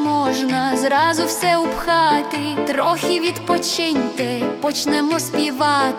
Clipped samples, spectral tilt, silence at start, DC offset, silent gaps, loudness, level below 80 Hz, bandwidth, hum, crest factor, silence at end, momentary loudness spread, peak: under 0.1%; -3.5 dB/octave; 0 s; under 0.1%; none; -18 LUFS; -50 dBFS; 18 kHz; none; 14 dB; 0 s; 5 LU; -4 dBFS